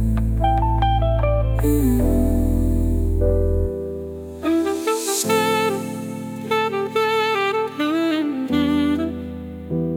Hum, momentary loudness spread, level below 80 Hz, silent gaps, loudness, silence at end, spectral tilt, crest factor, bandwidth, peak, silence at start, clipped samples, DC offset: none; 10 LU; -26 dBFS; none; -21 LUFS; 0 s; -5.5 dB/octave; 14 dB; 18 kHz; -6 dBFS; 0 s; under 0.1%; under 0.1%